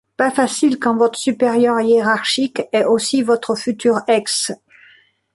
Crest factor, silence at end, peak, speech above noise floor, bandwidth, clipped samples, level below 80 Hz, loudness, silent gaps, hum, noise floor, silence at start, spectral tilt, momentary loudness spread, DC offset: 14 dB; 0.8 s; -2 dBFS; 35 dB; 11.5 kHz; under 0.1%; -64 dBFS; -17 LUFS; none; none; -51 dBFS; 0.2 s; -3 dB/octave; 5 LU; under 0.1%